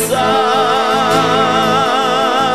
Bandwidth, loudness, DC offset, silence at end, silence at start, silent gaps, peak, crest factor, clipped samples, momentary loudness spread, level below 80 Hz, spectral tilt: 16 kHz; -12 LUFS; 0.9%; 0 s; 0 s; none; 0 dBFS; 12 dB; under 0.1%; 1 LU; -50 dBFS; -3.5 dB/octave